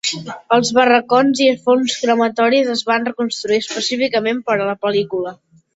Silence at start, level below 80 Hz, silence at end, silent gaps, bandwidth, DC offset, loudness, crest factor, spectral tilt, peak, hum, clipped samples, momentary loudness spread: 0.05 s; -62 dBFS; 0.4 s; none; 8 kHz; under 0.1%; -16 LUFS; 16 dB; -3.5 dB/octave; -2 dBFS; none; under 0.1%; 9 LU